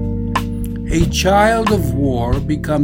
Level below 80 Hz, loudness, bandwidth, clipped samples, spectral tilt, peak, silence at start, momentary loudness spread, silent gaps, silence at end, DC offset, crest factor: -24 dBFS; -16 LUFS; 16.5 kHz; under 0.1%; -5.5 dB/octave; 0 dBFS; 0 s; 8 LU; none; 0 s; under 0.1%; 16 dB